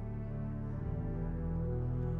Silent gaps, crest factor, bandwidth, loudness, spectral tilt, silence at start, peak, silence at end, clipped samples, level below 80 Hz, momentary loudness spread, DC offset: none; 10 dB; 3.1 kHz; -38 LUFS; -12 dB/octave; 0 s; -26 dBFS; 0 s; under 0.1%; -42 dBFS; 4 LU; under 0.1%